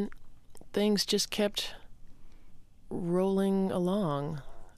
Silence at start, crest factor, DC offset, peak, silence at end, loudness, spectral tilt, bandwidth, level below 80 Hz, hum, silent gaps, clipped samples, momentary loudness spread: 0 s; 16 dB; under 0.1%; -16 dBFS; 0.05 s; -30 LUFS; -5 dB/octave; 15.5 kHz; -52 dBFS; none; none; under 0.1%; 11 LU